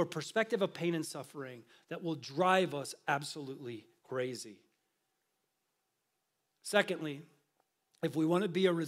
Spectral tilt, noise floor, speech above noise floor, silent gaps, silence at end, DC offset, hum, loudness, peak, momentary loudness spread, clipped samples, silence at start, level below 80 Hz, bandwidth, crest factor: -5 dB/octave; -84 dBFS; 49 dB; none; 0 s; under 0.1%; none; -35 LUFS; -14 dBFS; 17 LU; under 0.1%; 0 s; under -90 dBFS; 16 kHz; 24 dB